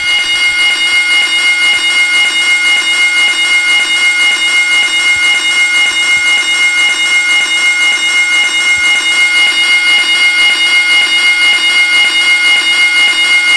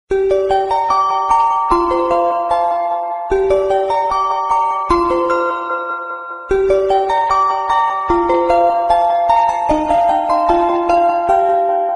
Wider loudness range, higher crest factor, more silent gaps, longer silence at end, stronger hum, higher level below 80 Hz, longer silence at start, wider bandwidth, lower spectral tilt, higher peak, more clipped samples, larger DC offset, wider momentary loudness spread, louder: about the same, 1 LU vs 2 LU; second, 8 dB vs 14 dB; neither; about the same, 0 s vs 0 s; neither; second, -52 dBFS vs -38 dBFS; about the same, 0 s vs 0.1 s; about the same, 11 kHz vs 11.5 kHz; second, 2.5 dB/octave vs -5.5 dB/octave; about the same, 0 dBFS vs -2 dBFS; neither; first, 0.4% vs under 0.1%; second, 2 LU vs 5 LU; first, -7 LUFS vs -15 LUFS